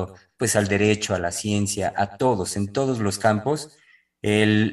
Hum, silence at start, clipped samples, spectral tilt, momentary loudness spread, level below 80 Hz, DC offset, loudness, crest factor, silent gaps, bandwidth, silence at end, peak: none; 0 s; under 0.1%; -4.5 dB/octave; 7 LU; -54 dBFS; under 0.1%; -23 LUFS; 18 dB; none; 13 kHz; 0 s; -4 dBFS